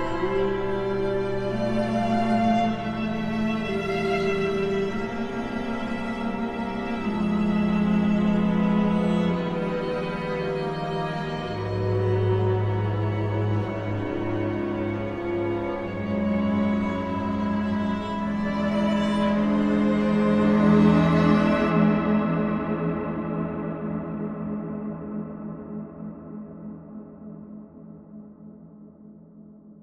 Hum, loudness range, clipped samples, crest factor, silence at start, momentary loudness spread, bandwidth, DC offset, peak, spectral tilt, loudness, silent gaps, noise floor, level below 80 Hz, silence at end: none; 14 LU; under 0.1%; 18 dB; 0 s; 15 LU; 9 kHz; under 0.1%; -8 dBFS; -8 dB/octave; -25 LUFS; none; -47 dBFS; -46 dBFS; 0 s